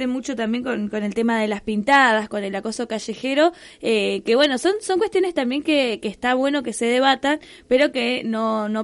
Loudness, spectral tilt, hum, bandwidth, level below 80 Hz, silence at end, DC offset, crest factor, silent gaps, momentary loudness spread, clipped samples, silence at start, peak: -21 LUFS; -4 dB/octave; none; 11.5 kHz; -56 dBFS; 0 s; under 0.1%; 16 dB; none; 9 LU; under 0.1%; 0 s; -4 dBFS